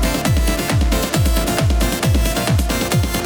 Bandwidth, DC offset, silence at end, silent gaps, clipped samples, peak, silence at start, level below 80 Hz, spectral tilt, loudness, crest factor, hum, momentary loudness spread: over 20 kHz; under 0.1%; 0 s; none; under 0.1%; -4 dBFS; 0 s; -20 dBFS; -4.5 dB/octave; -17 LUFS; 14 dB; none; 1 LU